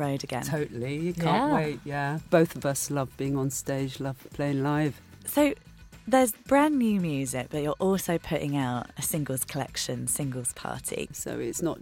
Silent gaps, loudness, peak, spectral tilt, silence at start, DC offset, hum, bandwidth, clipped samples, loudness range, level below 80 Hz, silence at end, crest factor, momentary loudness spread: none; -28 LUFS; -8 dBFS; -5 dB/octave; 0 s; under 0.1%; none; 17 kHz; under 0.1%; 3 LU; -54 dBFS; 0 s; 20 dB; 9 LU